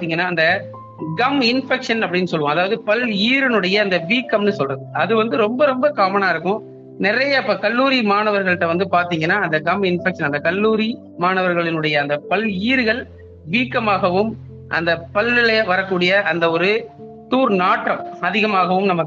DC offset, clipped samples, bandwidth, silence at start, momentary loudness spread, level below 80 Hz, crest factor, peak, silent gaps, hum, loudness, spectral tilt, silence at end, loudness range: under 0.1%; under 0.1%; 7.6 kHz; 0 s; 6 LU; -58 dBFS; 14 dB; -4 dBFS; none; none; -18 LUFS; -6 dB/octave; 0 s; 2 LU